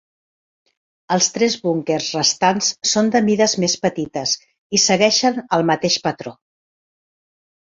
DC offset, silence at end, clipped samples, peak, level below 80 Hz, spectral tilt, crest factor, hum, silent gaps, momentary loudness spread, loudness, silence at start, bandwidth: under 0.1%; 1.45 s; under 0.1%; -2 dBFS; -62 dBFS; -3 dB/octave; 18 dB; none; 4.58-4.70 s; 8 LU; -17 LUFS; 1.1 s; 7.8 kHz